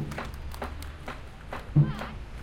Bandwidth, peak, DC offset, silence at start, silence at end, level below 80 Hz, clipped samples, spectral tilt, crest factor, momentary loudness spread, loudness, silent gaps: 15.5 kHz; -10 dBFS; under 0.1%; 0 s; 0 s; -42 dBFS; under 0.1%; -7.5 dB/octave; 20 dB; 16 LU; -32 LUFS; none